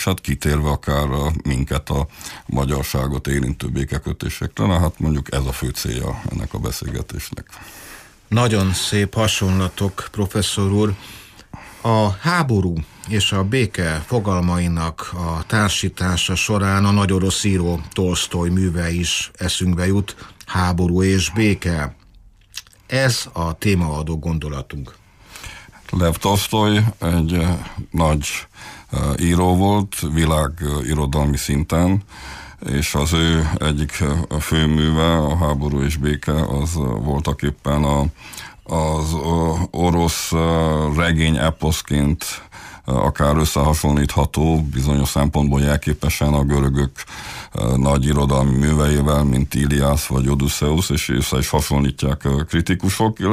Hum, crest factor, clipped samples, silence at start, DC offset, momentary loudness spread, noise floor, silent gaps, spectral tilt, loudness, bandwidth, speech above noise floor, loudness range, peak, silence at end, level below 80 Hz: none; 14 dB; under 0.1%; 0 s; under 0.1%; 11 LU; -48 dBFS; none; -5.5 dB/octave; -19 LUFS; 15.5 kHz; 29 dB; 4 LU; -6 dBFS; 0 s; -28 dBFS